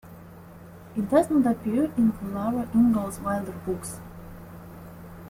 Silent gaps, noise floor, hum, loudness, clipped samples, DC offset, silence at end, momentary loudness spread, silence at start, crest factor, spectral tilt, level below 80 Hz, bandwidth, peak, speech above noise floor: none; -45 dBFS; none; -25 LUFS; under 0.1%; under 0.1%; 0 s; 24 LU; 0.05 s; 20 dB; -7 dB/octave; -52 dBFS; 16 kHz; -8 dBFS; 21 dB